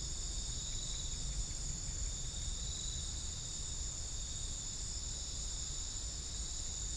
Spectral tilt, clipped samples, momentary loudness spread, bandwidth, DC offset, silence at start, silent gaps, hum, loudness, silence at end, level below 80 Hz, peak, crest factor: -2 dB/octave; under 0.1%; 1 LU; 10.5 kHz; under 0.1%; 0 s; none; none; -40 LUFS; 0 s; -44 dBFS; -28 dBFS; 14 dB